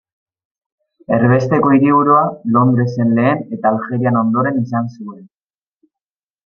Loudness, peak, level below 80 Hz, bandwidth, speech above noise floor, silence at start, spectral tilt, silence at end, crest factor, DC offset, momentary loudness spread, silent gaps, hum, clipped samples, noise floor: -14 LUFS; -2 dBFS; -56 dBFS; 6.6 kHz; 75 dB; 1.1 s; -9.5 dB/octave; 1.2 s; 14 dB; under 0.1%; 9 LU; none; none; under 0.1%; -89 dBFS